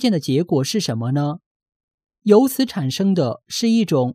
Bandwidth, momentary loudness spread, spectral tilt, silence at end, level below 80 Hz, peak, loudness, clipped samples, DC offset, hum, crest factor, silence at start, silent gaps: 15.5 kHz; 8 LU; -6 dB/octave; 0 s; -66 dBFS; 0 dBFS; -19 LUFS; under 0.1%; under 0.1%; none; 18 dB; 0 s; 1.46-1.66 s, 1.76-1.88 s, 1.94-1.98 s